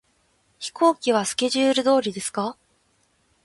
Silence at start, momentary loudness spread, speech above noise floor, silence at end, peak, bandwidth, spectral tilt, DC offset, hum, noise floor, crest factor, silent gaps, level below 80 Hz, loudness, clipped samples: 0.6 s; 12 LU; 44 dB; 0.9 s; -6 dBFS; 11.5 kHz; -3 dB/octave; under 0.1%; none; -65 dBFS; 18 dB; none; -68 dBFS; -22 LUFS; under 0.1%